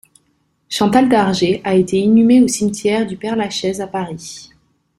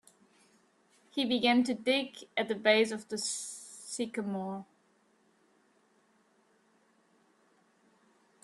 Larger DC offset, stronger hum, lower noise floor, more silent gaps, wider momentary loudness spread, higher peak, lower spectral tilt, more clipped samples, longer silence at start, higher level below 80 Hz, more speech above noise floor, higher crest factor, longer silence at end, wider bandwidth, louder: neither; neither; second, -63 dBFS vs -70 dBFS; neither; about the same, 14 LU vs 15 LU; first, 0 dBFS vs -10 dBFS; first, -5 dB/octave vs -3 dB/octave; neither; second, 0.7 s vs 1.15 s; first, -52 dBFS vs -82 dBFS; first, 48 dB vs 39 dB; second, 16 dB vs 24 dB; second, 0.55 s vs 3.8 s; about the same, 13.5 kHz vs 12.5 kHz; first, -15 LUFS vs -31 LUFS